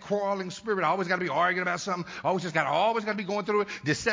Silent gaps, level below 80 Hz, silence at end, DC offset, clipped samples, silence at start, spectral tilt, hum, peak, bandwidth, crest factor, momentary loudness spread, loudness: none; -64 dBFS; 0 s; under 0.1%; under 0.1%; 0 s; -4.5 dB/octave; none; -10 dBFS; 7.6 kHz; 18 dB; 6 LU; -28 LUFS